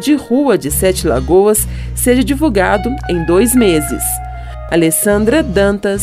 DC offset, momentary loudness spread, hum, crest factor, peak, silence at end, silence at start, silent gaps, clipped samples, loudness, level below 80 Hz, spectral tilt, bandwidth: under 0.1%; 7 LU; none; 12 dB; 0 dBFS; 0 s; 0 s; none; under 0.1%; -13 LUFS; -26 dBFS; -4.5 dB/octave; 16 kHz